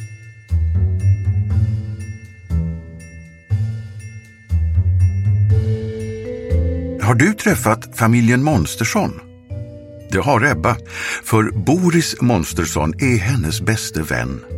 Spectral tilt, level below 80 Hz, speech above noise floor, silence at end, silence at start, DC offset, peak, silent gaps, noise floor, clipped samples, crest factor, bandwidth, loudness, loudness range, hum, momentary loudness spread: -6 dB/octave; -30 dBFS; 21 dB; 0 s; 0 s; under 0.1%; 0 dBFS; none; -38 dBFS; under 0.1%; 18 dB; 16 kHz; -18 LUFS; 5 LU; none; 17 LU